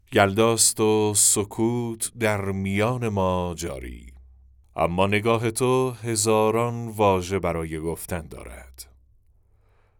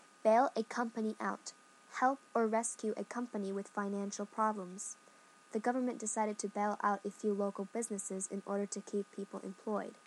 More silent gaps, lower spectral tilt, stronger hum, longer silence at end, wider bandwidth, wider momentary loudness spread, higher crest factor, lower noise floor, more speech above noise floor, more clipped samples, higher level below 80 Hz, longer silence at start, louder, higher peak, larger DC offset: neither; about the same, -4 dB/octave vs -4.5 dB/octave; neither; first, 1.15 s vs 0.1 s; first, over 20 kHz vs 12 kHz; first, 15 LU vs 11 LU; about the same, 22 dB vs 20 dB; about the same, -59 dBFS vs -62 dBFS; first, 37 dB vs 26 dB; neither; first, -50 dBFS vs under -90 dBFS; second, 0.1 s vs 0.25 s; first, -22 LUFS vs -37 LUFS; first, -2 dBFS vs -18 dBFS; neither